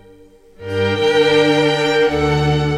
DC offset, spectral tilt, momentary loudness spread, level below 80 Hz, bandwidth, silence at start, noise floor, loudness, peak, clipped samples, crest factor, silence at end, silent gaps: under 0.1%; -5.5 dB/octave; 8 LU; -36 dBFS; 12.5 kHz; 0.6 s; -45 dBFS; -15 LUFS; -2 dBFS; under 0.1%; 14 dB; 0 s; none